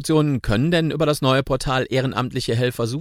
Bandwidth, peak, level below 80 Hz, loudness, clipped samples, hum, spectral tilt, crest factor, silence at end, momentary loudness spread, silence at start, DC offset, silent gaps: 16 kHz; -4 dBFS; -38 dBFS; -20 LUFS; under 0.1%; none; -6 dB/octave; 16 dB; 0 s; 4 LU; 0 s; under 0.1%; none